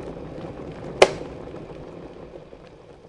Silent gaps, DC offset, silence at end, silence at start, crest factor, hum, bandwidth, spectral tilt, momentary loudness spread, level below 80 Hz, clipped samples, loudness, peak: none; under 0.1%; 0 s; 0 s; 28 dB; none; 11.5 kHz; -4 dB/octave; 25 LU; -50 dBFS; under 0.1%; -24 LUFS; 0 dBFS